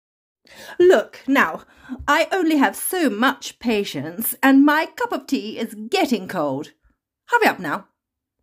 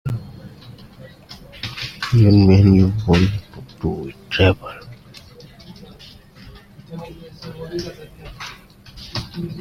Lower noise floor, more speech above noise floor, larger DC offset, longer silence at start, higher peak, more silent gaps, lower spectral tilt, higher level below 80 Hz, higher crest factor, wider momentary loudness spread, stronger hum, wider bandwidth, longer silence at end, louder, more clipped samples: first, -79 dBFS vs -43 dBFS; first, 59 dB vs 29 dB; neither; first, 0.6 s vs 0.05 s; about the same, -2 dBFS vs -2 dBFS; neither; second, -3.5 dB/octave vs -7.5 dB/octave; second, -56 dBFS vs -42 dBFS; about the same, 20 dB vs 18 dB; second, 14 LU vs 28 LU; neither; first, 16 kHz vs 10 kHz; first, 0.6 s vs 0 s; about the same, -20 LUFS vs -18 LUFS; neither